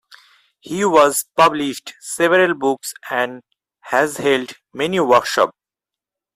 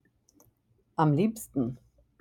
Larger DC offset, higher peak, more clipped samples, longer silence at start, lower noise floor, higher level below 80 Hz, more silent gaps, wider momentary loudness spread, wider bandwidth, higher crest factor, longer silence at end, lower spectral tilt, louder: neither; first, -2 dBFS vs -10 dBFS; neither; second, 0.65 s vs 1 s; first, -87 dBFS vs -69 dBFS; about the same, -62 dBFS vs -64 dBFS; neither; about the same, 11 LU vs 13 LU; about the same, 16 kHz vs 17.5 kHz; about the same, 18 dB vs 20 dB; first, 0.85 s vs 0.45 s; second, -3.5 dB/octave vs -7.5 dB/octave; first, -17 LUFS vs -29 LUFS